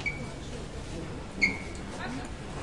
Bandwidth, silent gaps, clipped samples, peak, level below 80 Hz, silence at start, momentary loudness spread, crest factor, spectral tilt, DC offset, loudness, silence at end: 11.5 kHz; none; under 0.1%; -14 dBFS; -44 dBFS; 0 s; 12 LU; 22 dB; -4.5 dB/octave; 0.3%; -34 LUFS; 0 s